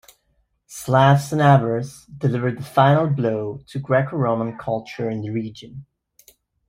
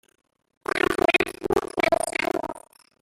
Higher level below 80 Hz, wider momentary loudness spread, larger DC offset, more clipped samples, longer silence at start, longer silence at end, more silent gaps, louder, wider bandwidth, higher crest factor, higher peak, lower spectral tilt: about the same, -56 dBFS vs -52 dBFS; first, 18 LU vs 14 LU; neither; neither; about the same, 0.7 s vs 0.75 s; first, 0.85 s vs 0.4 s; neither; first, -20 LUFS vs -24 LUFS; about the same, 15.5 kHz vs 16 kHz; about the same, 18 dB vs 20 dB; first, -2 dBFS vs -6 dBFS; first, -7 dB/octave vs -3.5 dB/octave